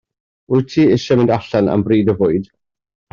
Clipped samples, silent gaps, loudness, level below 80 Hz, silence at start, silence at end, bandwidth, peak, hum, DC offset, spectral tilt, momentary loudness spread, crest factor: under 0.1%; none; -15 LUFS; -50 dBFS; 0.5 s; 0.7 s; 7.2 kHz; -2 dBFS; none; under 0.1%; -8 dB/octave; 5 LU; 14 dB